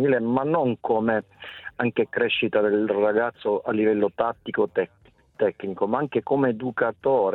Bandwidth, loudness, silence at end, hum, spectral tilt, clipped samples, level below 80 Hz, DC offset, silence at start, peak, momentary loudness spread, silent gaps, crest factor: 4.2 kHz; -24 LUFS; 0 s; none; -9 dB/octave; under 0.1%; -64 dBFS; under 0.1%; 0 s; -8 dBFS; 6 LU; none; 16 dB